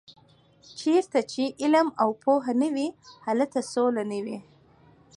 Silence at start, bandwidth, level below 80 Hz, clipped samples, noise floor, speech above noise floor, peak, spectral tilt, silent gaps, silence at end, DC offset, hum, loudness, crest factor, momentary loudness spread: 0.1 s; 11 kHz; -74 dBFS; under 0.1%; -58 dBFS; 33 dB; -10 dBFS; -4.5 dB/octave; none; 0.75 s; under 0.1%; none; -26 LUFS; 16 dB; 11 LU